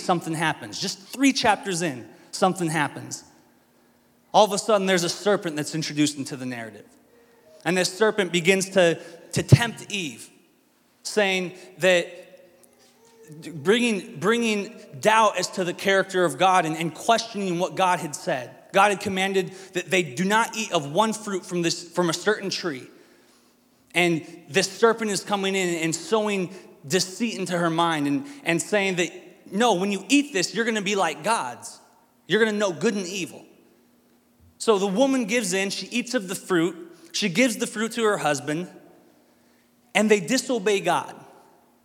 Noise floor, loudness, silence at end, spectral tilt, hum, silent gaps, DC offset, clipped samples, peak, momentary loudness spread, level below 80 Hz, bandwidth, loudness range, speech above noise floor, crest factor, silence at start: -62 dBFS; -23 LUFS; 0.6 s; -4 dB/octave; none; none; under 0.1%; under 0.1%; 0 dBFS; 11 LU; -64 dBFS; 17 kHz; 4 LU; 39 dB; 24 dB; 0 s